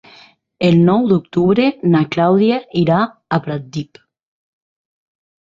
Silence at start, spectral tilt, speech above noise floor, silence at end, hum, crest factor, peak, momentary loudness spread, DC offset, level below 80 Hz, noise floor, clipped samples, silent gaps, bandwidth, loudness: 0.6 s; -8.5 dB/octave; 32 dB; 1.6 s; none; 14 dB; -2 dBFS; 12 LU; under 0.1%; -54 dBFS; -47 dBFS; under 0.1%; none; 7.4 kHz; -15 LUFS